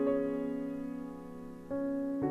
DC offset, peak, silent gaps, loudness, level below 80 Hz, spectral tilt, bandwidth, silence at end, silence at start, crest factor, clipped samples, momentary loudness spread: under 0.1%; -20 dBFS; none; -37 LUFS; -62 dBFS; -9 dB/octave; 5.4 kHz; 0 s; 0 s; 16 dB; under 0.1%; 13 LU